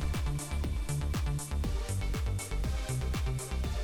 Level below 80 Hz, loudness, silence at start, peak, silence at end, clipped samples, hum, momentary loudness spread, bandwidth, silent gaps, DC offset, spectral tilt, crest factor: -34 dBFS; -35 LUFS; 0 s; -22 dBFS; 0 s; under 0.1%; none; 2 LU; 19 kHz; none; under 0.1%; -5 dB/octave; 10 dB